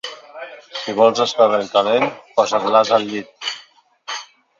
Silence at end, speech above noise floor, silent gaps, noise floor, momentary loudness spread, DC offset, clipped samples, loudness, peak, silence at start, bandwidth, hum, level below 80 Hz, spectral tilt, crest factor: 0.35 s; 32 dB; none; -49 dBFS; 19 LU; under 0.1%; under 0.1%; -17 LUFS; 0 dBFS; 0.05 s; 7.6 kHz; none; -66 dBFS; -3.5 dB/octave; 18 dB